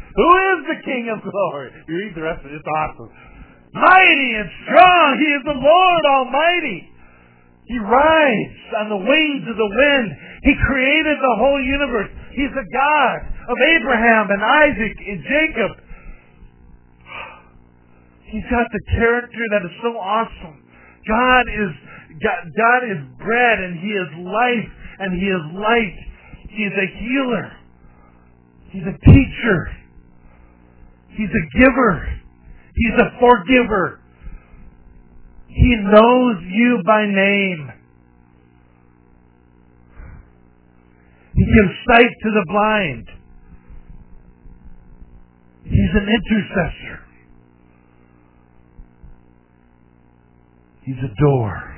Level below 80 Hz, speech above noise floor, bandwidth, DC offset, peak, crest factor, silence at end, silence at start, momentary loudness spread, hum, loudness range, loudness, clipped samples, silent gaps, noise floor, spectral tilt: -32 dBFS; 36 dB; 4 kHz; under 0.1%; 0 dBFS; 18 dB; 0 s; 0.1 s; 16 LU; none; 10 LU; -16 LUFS; under 0.1%; none; -52 dBFS; -9.5 dB/octave